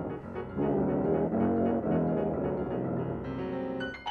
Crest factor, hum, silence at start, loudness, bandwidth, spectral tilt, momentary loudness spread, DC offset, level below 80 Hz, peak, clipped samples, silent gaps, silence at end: 14 dB; none; 0 s; -31 LUFS; 4.8 kHz; -9.5 dB/octave; 7 LU; under 0.1%; -52 dBFS; -16 dBFS; under 0.1%; none; 0 s